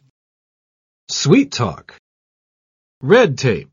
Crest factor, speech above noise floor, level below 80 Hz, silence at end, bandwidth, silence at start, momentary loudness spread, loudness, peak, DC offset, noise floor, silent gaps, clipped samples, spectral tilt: 18 dB; over 75 dB; -54 dBFS; 0.1 s; 7.4 kHz; 1.1 s; 13 LU; -15 LUFS; 0 dBFS; under 0.1%; under -90 dBFS; 1.99-3.01 s; under 0.1%; -5 dB/octave